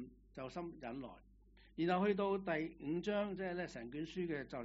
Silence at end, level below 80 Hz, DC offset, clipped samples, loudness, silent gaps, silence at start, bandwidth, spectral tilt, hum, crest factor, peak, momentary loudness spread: 0 s; -66 dBFS; under 0.1%; under 0.1%; -41 LUFS; none; 0 s; 7.6 kHz; -5 dB/octave; none; 18 dB; -22 dBFS; 15 LU